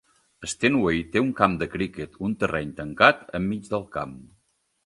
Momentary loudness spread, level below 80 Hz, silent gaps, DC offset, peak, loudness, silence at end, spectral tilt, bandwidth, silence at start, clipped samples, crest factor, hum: 15 LU; -50 dBFS; none; under 0.1%; 0 dBFS; -24 LUFS; 0.65 s; -5 dB/octave; 11.5 kHz; 0.4 s; under 0.1%; 26 dB; none